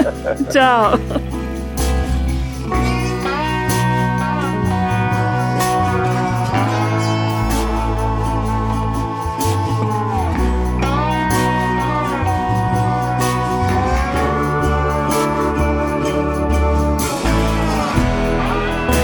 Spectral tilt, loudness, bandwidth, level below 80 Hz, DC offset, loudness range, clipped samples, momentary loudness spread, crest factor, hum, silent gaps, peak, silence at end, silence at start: -6 dB/octave; -18 LUFS; over 20 kHz; -24 dBFS; under 0.1%; 2 LU; under 0.1%; 3 LU; 16 dB; none; none; -2 dBFS; 0 s; 0 s